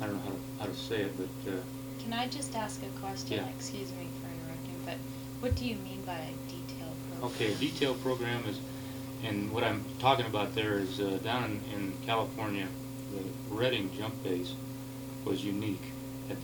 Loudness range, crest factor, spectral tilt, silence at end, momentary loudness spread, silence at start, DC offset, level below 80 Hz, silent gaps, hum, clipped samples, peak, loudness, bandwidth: 6 LU; 22 dB; -5 dB/octave; 0 s; 10 LU; 0 s; under 0.1%; -56 dBFS; none; 60 Hz at -65 dBFS; under 0.1%; -12 dBFS; -35 LUFS; 19 kHz